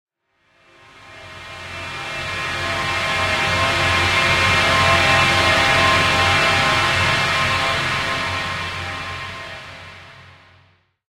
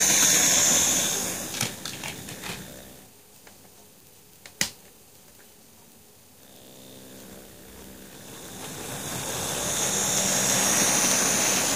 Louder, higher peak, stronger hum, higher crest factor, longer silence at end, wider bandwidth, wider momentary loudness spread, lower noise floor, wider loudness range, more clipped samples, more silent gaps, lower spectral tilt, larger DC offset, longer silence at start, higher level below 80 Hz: first, -17 LUFS vs -22 LUFS; about the same, -2 dBFS vs -4 dBFS; neither; about the same, 18 dB vs 22 dB; first, 0.9 s vs 0 s; about the same, 16 kHz vs 16 kHz; second, 18 LU vs 27 LU; first, -63 dBFS vs -53 dBFS; second, 10 LU vs 22 LU; neither; neither; first, -3 dB/octave vs -1 dB/octave; second, under 0.1% vs 0.1%; first, 1 s vs 0 s; first, -42 dBFS vs -58 dBFS